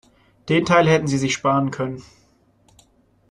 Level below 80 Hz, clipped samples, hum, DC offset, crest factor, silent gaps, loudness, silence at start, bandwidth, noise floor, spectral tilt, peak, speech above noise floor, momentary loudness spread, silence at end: -54 dBFS; under 0.1%; none; under 0.1%; 20 dB; none; -19 LUFS; 0.45 s; 11 kHz; -59 dBFS; -5.5 dB/octave; -2 dBFS; 40 dB; 15 LU; 1.3 s